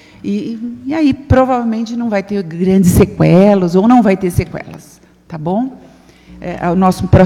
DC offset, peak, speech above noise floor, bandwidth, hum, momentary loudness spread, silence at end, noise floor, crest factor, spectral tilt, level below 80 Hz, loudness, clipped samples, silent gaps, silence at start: under 0.1%; 0 dBFS; 27 dB; 16 kHz; none; 15 LU; 0 s; -39 dBFS; 12 dB; -7.5 dB/octave; -32 dBFS; -13 LUFS; 0.3%; none; 0.25 s